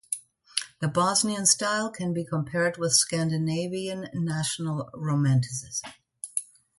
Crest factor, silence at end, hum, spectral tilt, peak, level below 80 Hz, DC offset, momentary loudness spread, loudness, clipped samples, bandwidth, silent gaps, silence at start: 24 dB; 0.35 s; none; -3.5 dB/octave; -4 dBFS; -66 dBFS; under 0.1%; 11 LU; -26 LUFS; under 0.1%; 12 kHz; none; 0.1 s